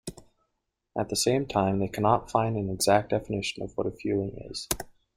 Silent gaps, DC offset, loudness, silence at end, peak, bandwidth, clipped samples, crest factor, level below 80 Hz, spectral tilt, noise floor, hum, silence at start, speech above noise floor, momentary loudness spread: none; under 0.1%; -28 LUFS; 0.25 s; -4 dBFS; 16 kHz; under 0.1%; 24 dB; -52 dBFS; -4.5 dB/octave; -81 dBFS; none; 0.05 s; 53 dB; 10 LU